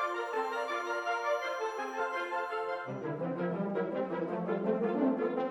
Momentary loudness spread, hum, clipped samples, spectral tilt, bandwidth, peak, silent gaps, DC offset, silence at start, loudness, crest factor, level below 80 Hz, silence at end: 5 LU; none; under 0.1%; -6.5 dB/octave; 17 kHz; -18 dBFS; none; under 0.1%; 0 s; -34 LUFS; 16 dB; -78 dBFS; 0 s